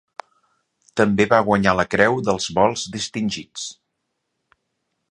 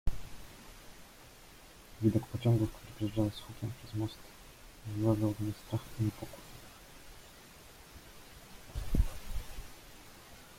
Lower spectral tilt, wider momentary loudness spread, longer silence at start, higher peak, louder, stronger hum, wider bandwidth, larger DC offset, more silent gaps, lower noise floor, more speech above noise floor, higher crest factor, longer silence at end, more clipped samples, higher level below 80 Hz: second, -4.5 dB/octave vs -7 dB/octave; second, 15 LU vs 22 LU; first, 0.95 s vs 0.05 s; first, 0 dBFS vs -16 dBFS; first, -19 LUFS vs -36 LUFS; neither; second, 11 kHz vs 16.5 kHz; neither; neither; first, -76 dBFS vs -55 dBFS; first, 57 dB vs 21 dB; about the same, 22 dB vs 20 dB; first, 1.4 s vs 0 s; neither; second, -50 dBFS vs -44 dBFS